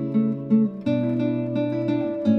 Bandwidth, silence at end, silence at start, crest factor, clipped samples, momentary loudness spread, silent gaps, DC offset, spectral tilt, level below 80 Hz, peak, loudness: 5.6 kHz; 0 s; 0 s; 12 dB; under 0.1%; 3 LU; none; under 0.1%; -10 dB/octave; -62 dBFS; -10 dBFS; -23 LUFS